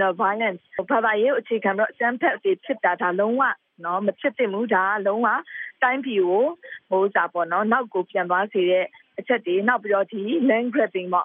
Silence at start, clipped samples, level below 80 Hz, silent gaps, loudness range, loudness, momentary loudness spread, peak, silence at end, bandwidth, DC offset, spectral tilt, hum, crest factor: 0 s; under 0.1%; -80 dBFS; none; 1 LU; -22 LUFS; 5 LU; -6 dBFS; 0 s; 3.8 kHz; under 0.1%; -3 dB/octave; none; 16 dB